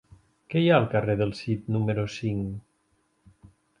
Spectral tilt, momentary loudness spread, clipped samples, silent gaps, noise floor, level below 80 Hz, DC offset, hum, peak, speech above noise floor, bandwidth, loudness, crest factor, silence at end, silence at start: -7.5 dB/octave; 11 LU; under 0.1%; none; -70 dBFS; -54 dBFS; under 0.1%; none; -6 dBFS; 45 dB; 10.5 kHz; -26 LUFS; 22 dB; 1.2 s; 0.5 s